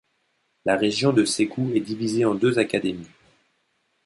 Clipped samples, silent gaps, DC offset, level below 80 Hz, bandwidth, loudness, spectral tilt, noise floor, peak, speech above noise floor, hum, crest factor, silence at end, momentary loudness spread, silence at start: under 0.1%; none; under 0.1%; -62 dBFS; 11.5 kHz; -23 LUFS; -5 dB/octave; -70 dBFS; -6 dBFS; 48 dB; none; 18 dB; 1 s; 8 LU; 0.65 s